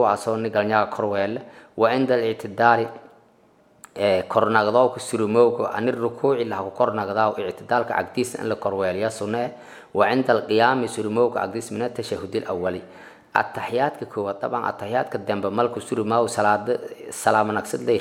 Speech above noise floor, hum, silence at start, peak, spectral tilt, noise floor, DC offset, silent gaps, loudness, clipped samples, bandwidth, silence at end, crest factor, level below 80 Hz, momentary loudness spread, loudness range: 35 dB; none; 0 s; 0 dBFS; -5 dB/octave; -57 dBFS; under 0.1%; none; -23 LUFS; under 0.1%; 16 kHz; 0 s; 22 dB; -68 dBFS; 9 LU; 4 LU